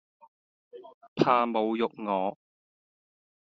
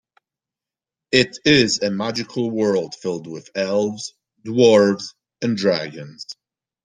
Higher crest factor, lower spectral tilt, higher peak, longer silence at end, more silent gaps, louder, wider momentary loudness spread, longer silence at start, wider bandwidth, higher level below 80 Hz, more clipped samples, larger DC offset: first, 26 dB vs 20 dB; about the same, -4.5 dB/octave vs -4.5 dB/octave; second, -6 dBFS vs 0 dBFS; first, 1.15 s vs 0.5 s; first, 0.94-1.01 s, 1.08-1.16 s vs none; second, -27 LUFS vs -19 LUFS; second, 9 LU vs 20 LU; second, 0.75 s vs 1.1 s; second, 7.6 kHz vs 9.8 kHz; second, -74 dBFS vs -58 dBFS; neither; neither